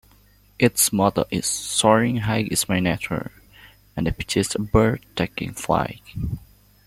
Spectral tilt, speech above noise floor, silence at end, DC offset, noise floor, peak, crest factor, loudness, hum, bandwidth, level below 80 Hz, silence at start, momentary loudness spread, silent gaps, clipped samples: -4 dB/octave; 33 dB; 0.4 s; under 0.1%; -55 dBFS; -2 dBFS; 20 dB; -22 LUFS; none; 16.5 kHz; -42 dBFS; 0.6 s; 13 LU; none; under 0.1%